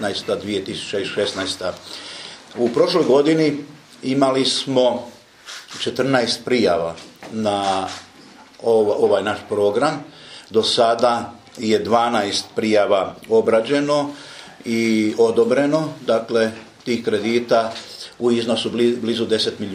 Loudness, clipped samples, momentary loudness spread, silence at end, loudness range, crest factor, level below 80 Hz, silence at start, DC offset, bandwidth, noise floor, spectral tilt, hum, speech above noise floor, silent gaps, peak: -19 LUFS; under 0.1%; 16 LU; 0 s; 2 LU; 18 dB; -62 dBFS; 0 s; under 0.1%; 14.5 kHz; -45 dBFS; -4.5 dB/octave; none; 26 dB; none; -2 dBFS